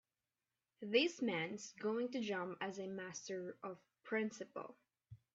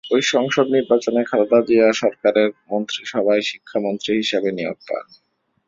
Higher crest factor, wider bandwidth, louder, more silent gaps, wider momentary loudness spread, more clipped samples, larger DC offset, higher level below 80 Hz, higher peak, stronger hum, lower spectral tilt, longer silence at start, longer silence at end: first, 22 dB vs 16 dB; about the same, 7.8 kHz vs 7.8 kHz; second, -42 LUFS vs -19 LUFS; neither; first, 16 LU vs 10 LU; neither; neither; second, -86 dBFS vs -64 dBFS; second, -22 dBFS vs -2 dBFS; neither; about the same, -3 dB/octave vs -4 dB/octave; first, 0.8 s vs 0.05 s; second, 0.2 s vs 0.65 s